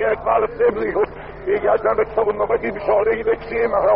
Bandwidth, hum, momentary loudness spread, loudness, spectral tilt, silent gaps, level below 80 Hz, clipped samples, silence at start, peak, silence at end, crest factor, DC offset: 5.2 kHz; none; 4 LU; -19 LUFS; -4.5 dB/octave; none; -42 dBFS; under 0.1%; 0 s; -4 dBFS; 0 s; 14 dB; under 0.1%